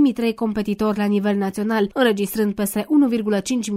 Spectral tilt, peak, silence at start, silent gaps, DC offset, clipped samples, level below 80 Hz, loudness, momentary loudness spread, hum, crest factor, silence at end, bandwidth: -5.5 dB/octave; -4 dBFS; 0 s; none; under 0.1%; under 0.1%; -52 dBFS; -20 LUFS; 4 LU; none; 16 dB; 0 s; 16 kHz